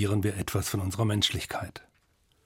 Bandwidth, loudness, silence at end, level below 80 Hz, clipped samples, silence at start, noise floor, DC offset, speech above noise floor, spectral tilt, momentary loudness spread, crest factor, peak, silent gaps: 16.5 kHz; -29 LUFS; 0.65 s; -54 dBFS; under 0.1%; 0 s; -68 dBFS; under 0.1%; 39 dB; -4.5 dB/octave; 13 LU; 20 dB; -10 dBFS; none